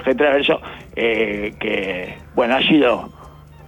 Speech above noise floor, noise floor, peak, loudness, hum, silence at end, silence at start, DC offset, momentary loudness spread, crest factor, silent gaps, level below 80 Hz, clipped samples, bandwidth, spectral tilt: 23 dB; -41 dBFS; -4 dBFS; -18 LUFS; none; 0 s; 0 s; under 0.1%; 11 LU; 14 dB; none; -46 dBFS; under 0.1%; 17.5 kHz; -6 dB/octave